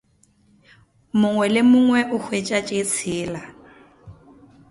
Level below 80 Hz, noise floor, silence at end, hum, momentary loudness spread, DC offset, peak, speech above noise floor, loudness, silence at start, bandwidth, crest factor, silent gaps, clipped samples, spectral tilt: -58 dBFS; -59 dBFS; 0.6 s; none; 14 LU; under 0.1%; -6 dBFS; 40 dB; -20 LUFS; 1.15 s; 11.5 kHz; 16 dB; none; under 0.1%; -4.5 dB/octave